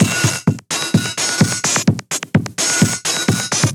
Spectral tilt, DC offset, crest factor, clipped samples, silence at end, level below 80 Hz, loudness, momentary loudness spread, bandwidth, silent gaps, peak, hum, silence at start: -3.5 dB/octave; under 0.1%; 16 dB; under 0.1%; 0 s; -50 dBFS; -16 LUFS; 5 LU; 19.5 kHz; none; -2 dBFS; none; 0 s